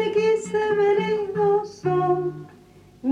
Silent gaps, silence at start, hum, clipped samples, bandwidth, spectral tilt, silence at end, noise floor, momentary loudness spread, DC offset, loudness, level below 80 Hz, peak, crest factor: none; 0 s; none; under 0.1%; 9.8 kHz; -6.5 dB/octave; 0 s; -50 dBFS; 8 LU; under 0.1%; -22 LUFS; -62 dBFS; -10 dBFS; 12 dB